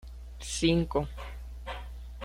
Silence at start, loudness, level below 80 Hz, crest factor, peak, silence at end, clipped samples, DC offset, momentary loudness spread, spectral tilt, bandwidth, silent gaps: 0 s; -31 LUFS; -42 dBFS; 20 dB; -12 dBFS; 0 s; under 0.1%; under 0.1%; 17 LU; -5 dB/octave; 15.5 kHz; none